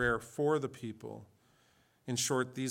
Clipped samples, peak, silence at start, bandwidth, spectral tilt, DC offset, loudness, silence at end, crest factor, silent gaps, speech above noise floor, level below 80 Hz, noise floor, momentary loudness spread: under 0.1%; -18 dBFS; 0 s; 17 kHz; -4 dB/octave; under 0.1%; -34 LUFS; 0 s; 18 dB; none; 35 dB; -60 dBFS; -69 dBFS; 17 LU